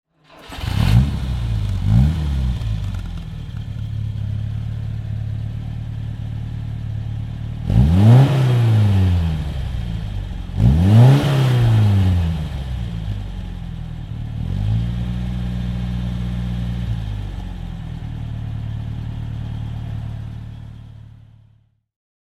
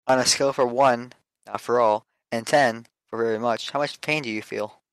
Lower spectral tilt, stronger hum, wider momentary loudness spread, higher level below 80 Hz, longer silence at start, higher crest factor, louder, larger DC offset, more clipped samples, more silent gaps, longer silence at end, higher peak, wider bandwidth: first, -8 dB/octave vs -3 dB/octave; neither; about the same, 15 LU vs 13 LU; first, -28 dBFS vs -68 dBFS; first, 0.35 s vs 0.05 s; about the same, 18 dB vs 18 dB; first, -20 LUFS vs -23 LUFS; neither; neither; neither; first, 1.25 s vs 0.25 s; first, 0 dBFS vs -6 dBFS; second, 12.5 kHz vs 14 kHz